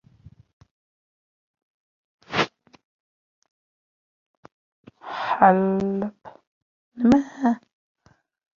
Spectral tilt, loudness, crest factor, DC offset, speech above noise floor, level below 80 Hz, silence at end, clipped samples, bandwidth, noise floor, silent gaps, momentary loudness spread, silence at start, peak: -6.5 dB/octave; -22 LUFS; 24 dB; under 0.1%; 32 dB; -60 dBFS; 1 s; under 0.1%; 7.4 kHz; -52 dBFS; 2.84-3.42 s, 3.51-4.43 s, 4.52-4.84 s, 6.47-6.92 s; 15 LU; 2.3 s; -2 dBFS